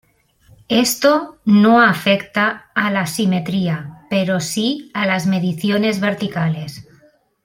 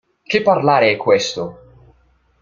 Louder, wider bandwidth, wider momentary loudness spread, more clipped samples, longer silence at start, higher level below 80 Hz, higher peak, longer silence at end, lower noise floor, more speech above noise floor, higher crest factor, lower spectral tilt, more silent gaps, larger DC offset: about the same, -17 LUFS vs -16 LUFS; first, 16.5 kHz vs 7.6 kHz; second, 9 LU vs 12 LU; neither; first, 0.7 s vs 0.3 s; about the same, -58 dBFS vs -56 dBFS; about the same, -2 dBFS vs 0 dBFS; second, 0.65 s vs 0.9 s; second, -53 dBFS vs -57 dBFS; second, 37 dB vs 42 dB; about the same, 16 dB vs 18 dB; about the same, -5 dB/octave vs -4.5 dB/octave; neither; neither